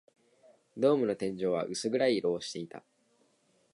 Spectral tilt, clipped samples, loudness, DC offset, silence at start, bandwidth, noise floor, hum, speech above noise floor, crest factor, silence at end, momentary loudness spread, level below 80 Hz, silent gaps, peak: -5 dB/octave; under 0.1%; -31 LUFS; under 0.1%; 0.75 s; 11.5 kHz; -70 dBFS; none; 40 dB; 18 dB; 0.95 s; 17 LU; -74 dBFS; none; -14 dBFS